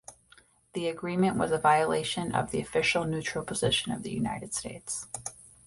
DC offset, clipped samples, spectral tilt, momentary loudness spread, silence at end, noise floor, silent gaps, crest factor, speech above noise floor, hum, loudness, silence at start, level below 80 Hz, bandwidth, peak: under 0.1%; under 0.1%; -4 dB/octave; 11 LU; 0.2 s; -61 dBFS; none; 20 dB; 32 dB; none; -29 LUFS; 0.1 s; -56 dBFS; 11.5 kHz; -10 dBFS